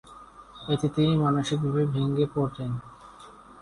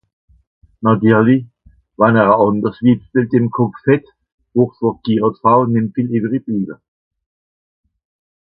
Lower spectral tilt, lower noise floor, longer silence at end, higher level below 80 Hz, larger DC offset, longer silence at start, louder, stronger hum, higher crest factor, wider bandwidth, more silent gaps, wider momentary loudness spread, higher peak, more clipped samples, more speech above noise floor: second, -7.5 dB/octave vs -12 dB/octave; second, -49 dBFS vs under -90 dBFS; second, 0 s vs 1.65 s; about the same, -54 dBFS vs -54 dBFS; neither; second, 0.05 s vs 0.8 s; second, -26 LUFS vs -15 LUFS; neither; about the same, 16 dB vs 16 dB; first, 11 kHz vs 4.7 kHz; second, none vs 4.32-4.38 s; first, 20 LU vs 8 LU; second, -12 dBFS vs 0 dBFS; neither; second, 23 dB vs over 76 dB